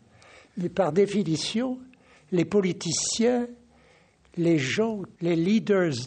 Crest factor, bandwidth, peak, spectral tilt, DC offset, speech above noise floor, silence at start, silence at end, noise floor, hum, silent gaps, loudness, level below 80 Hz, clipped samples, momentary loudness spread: 16 dB; 9.4 kHz; -10 dBFS; -5 dB/octave; under 0.1%; 34 dB; 0.55 s; 0 s; -59 dBFS; none; none; -25 LUFS; -64 dBFS; under 0.1%; 10 LU